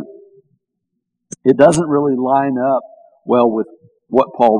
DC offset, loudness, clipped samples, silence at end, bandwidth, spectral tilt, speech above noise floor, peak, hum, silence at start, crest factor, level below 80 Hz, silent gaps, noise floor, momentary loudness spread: under 0.1%; -15 LUFS; 0.2%; 0 s; 11 kHz; -6.5 dB/octave; 61 dB; 0 dBFS; none; 0 s; 16 dB; -58 dBFS; none; -75 dBFS; 18 LU